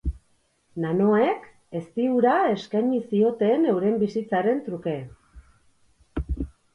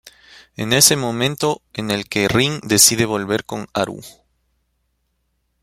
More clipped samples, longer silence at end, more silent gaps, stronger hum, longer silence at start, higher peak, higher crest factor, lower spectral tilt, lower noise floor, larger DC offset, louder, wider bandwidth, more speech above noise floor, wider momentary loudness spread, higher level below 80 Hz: neither; second, 0.25 s vs 1.55 s; neither; neither; about the same, 0.05 s vs 0.05 s; second, -8 dBFS vs 0 dBFS; about the same, 16 dB vs 20 dB; first, -8.5 dB/octave vs -2.5 dB/octave; about the same, -66 dBFS vs -69 dBFS; neither; second, -24 LUFS vs -16 LUFS; second, 10 kHz vs 16.5 kHz; second, 44 dB vs 51 dB; about the same, 15 LU vs 14 LU; first, -40 dBFS vs -50 dBFS